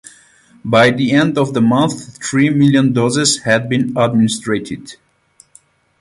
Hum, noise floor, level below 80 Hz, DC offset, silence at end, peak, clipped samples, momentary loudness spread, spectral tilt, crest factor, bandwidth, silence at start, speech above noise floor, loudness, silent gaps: none; -51 dBFS; -52 dBFS; under 0.1%; 1.05 s; 0 dBFS; under 0.1%; 9 LU; -5 dB/octave; 16 dB; 11.5 kHz; 0.65 s; 38 dB; -14 LUFS; none